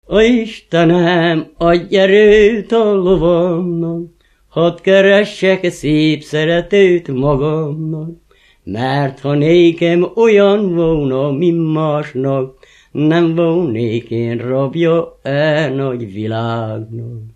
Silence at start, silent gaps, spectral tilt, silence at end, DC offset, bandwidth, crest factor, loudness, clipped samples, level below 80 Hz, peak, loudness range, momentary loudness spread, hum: 0.1 s; none; -7 dB/octave; 0.05 s; under 0.1%; 9.8 kHz; 14 dB; -13 LUFS; under 0.1%; -40 dBFS; 0 dBFS; 5 LU; 11 LU; none